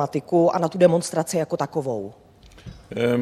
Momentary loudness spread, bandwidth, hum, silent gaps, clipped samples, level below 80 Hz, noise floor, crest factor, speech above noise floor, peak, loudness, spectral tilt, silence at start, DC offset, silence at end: 13 LU; 14 kHz; none; none; under 0.1%; -56 dBFS; -43 dBFS; 18 dB; 22 dB; -4 dBFS; -22 LUFS; -6 dB/octave; 0 s; under 0.1%; 0 s